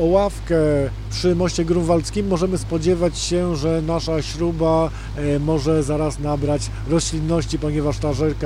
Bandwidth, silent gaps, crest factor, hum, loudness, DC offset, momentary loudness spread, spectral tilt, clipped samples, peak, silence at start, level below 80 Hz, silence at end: 13 kHz; none; 16 dB; none; -20 LUFS; under 0.1%; 4 LU; -6 dB/octave; under 0.1%; -4 dBFS; 0 s; -30 dBFS; 0 s